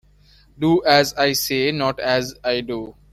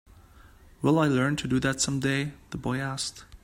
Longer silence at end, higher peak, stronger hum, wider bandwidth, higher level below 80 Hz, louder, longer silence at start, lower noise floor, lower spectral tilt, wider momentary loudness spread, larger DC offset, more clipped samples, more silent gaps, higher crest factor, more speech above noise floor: first, 0.2 s vs 0.05 s; first, -2 dBFS vs -10 dBFS; neither; about the same, 16.5 kHz vs 16 kHz; about the same, -50 dBFS vs -52 dBFS; first, -19 LUFS vs -27 LUFS; first, 0.6 s vs 0.45 s; about the same, -52 dBFS vs -53 dBFS; about the same, -4 dB/octave vs -5 dB/octave; about the same, 9 LU vs 10 LU; neither; neither; neither; about the same, 18 dB vs 18 dB; first, 33 dB vs 26 dB